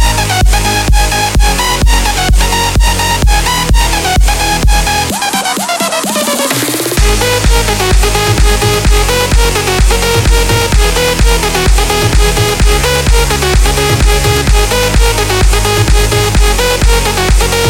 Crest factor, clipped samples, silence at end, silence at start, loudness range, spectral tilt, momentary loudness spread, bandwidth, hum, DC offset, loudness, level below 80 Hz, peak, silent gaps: 8 dB; under 0.1%; 0 s; 0 s; 1 LU; -3.5 dB/octave; 2 LU; 17 kHz; none; under 0.1%; -10 LUFS; -12 dBFS; 0 dBFS; none